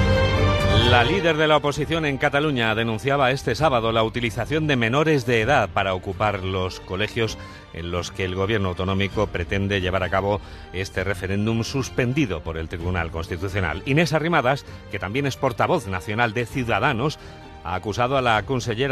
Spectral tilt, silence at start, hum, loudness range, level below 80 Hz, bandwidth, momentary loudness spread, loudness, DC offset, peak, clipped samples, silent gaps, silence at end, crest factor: -5.5 dB/octave; 0 s; none; 5 LU; -38 dBFS; 13.5 kHz; 9 LU; -22 LUFS; under 0.1%; -2 dBFS; under 0.1%; none; 0 s; 20 dB